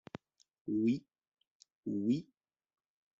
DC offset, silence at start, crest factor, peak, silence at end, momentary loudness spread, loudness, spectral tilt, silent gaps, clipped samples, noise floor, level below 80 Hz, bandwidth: under 0.1%; 0.65 s; 18 dB; -22 dBFS; 0.95 s; 18 LU; -36 LUFS; -8 dB/octave; 1.28-1.32 s, 1.47-1.60 s, 1.72-1.83 s; under 0.1%; -54 dBFS; -78 dBFS; 7.6 kHz